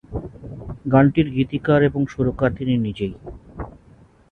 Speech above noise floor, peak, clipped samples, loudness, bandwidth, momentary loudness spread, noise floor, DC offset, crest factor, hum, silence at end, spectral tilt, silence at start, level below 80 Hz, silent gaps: 31 dB; -2 dBFS; under 0.1%; -20 LUFS; 6.4 kHz; 20 LU; -50 dBFS; under 0.1%; 18 dB; none; 0.6 s; -9 dB/octave; 0.1 s; -42 dBFS; none